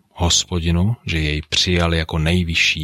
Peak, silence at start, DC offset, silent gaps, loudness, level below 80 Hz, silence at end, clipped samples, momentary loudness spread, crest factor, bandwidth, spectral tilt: -2 dBFS; 0.15 s; under 0.1%; none; -18 LUFS; -30 dBFS; 0 s; under 0.1%; 5 LU; 16 dB; 14 kHz; -3.5 dB/octave